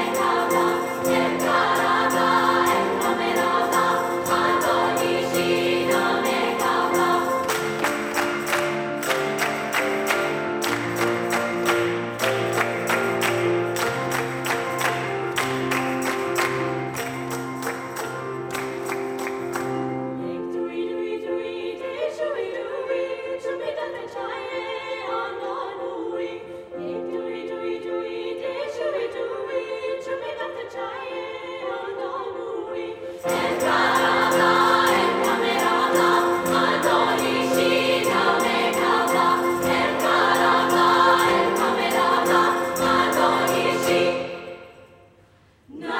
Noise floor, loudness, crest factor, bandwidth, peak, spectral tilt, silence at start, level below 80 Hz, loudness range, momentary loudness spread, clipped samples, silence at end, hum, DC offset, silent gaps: -55 dBFS; -22 LUFS; 18 dB; over 20 kHz; -4 dBFS; -3.5 dB/octave; 0 s; -60 dBFS; 10 LU; 12 LU; under 0.1%; 0 s; none; under 0.1%; none